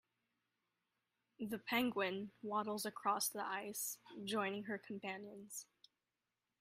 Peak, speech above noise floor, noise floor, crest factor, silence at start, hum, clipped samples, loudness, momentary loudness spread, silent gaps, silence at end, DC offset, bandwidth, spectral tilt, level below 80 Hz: -24 dBFS; over 47 dB; under -90 dBFS; 20 dB; 1.4 s; none; under 0.1%; -42 LUFS; 12 LU; none; 0.95 s; under 0.1%; 15.5 kHz; -3 dB/octave; -86 dBFS